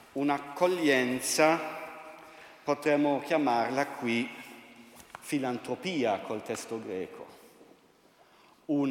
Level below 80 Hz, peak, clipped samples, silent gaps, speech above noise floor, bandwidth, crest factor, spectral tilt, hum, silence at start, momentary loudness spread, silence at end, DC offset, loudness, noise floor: -76 dBFS; -8 dBFS; under 0.1%; none; 32 dB; 17 kHz; 22 dB; -4 dB/octave; none; 0.15 s; 22 LU; 0 s; under 0.1%; -30 LUFS; -62 dBFS